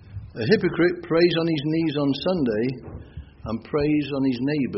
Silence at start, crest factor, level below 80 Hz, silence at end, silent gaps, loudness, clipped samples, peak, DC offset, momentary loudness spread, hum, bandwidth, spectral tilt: 0.1 s; 18 dB; -48 dBFS; 0 s; none; -23 LUFS; under 0.1%; -6 dBFS; under 0.1%; 18 LU; none; 6 kHz; -5.5 dB/octave